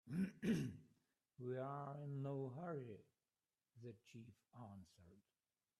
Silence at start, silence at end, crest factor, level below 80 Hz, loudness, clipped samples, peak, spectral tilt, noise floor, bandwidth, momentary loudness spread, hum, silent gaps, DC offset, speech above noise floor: 0.05 s; 0.6 s; 20 dB; -82 dBFS; -48 LUFS; under 0.1%; -30 dBFS; -7.5 dB/octave; under -90 dBFS; 13 kHz; 20 LU; none; none; under 0.1%; over 36 dB